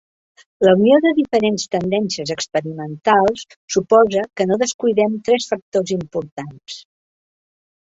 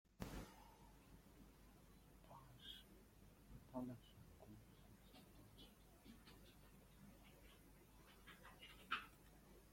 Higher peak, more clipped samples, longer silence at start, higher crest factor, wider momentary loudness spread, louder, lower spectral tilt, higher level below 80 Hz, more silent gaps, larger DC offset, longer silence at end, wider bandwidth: first, -2 dBFS vs -32 dBFS; neither; first, 0.6 s vs 0.05 s; second, 16 dB vs 28 dB; about the same, 16 LU vs 15 LU; first, -17 LUFS vs -60 LUFS; about the same, -5 dB/octave vs -4.5 dB/octave; first, -58 dBFS vs -70 dBFS; first, 3.56-3.68 s, 4.74-4.79 s, 5.62-5.72 s, 6.32-6.37 s vs none; neither; first, 1.15 s vs 0 s; second, 8 kHz vs 16.5 kHz